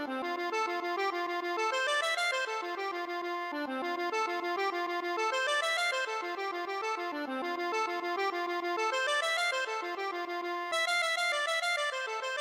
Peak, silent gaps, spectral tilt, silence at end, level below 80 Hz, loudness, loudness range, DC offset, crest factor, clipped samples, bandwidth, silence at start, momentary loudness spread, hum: -20 dBFS; none; 0 dB/octave; 0 s; -88 dBFS; -32 LUFS; 2 LU; under 0.1%; 12 dB; under 0.1%; 16 kHz; 0 s; 7 LU; none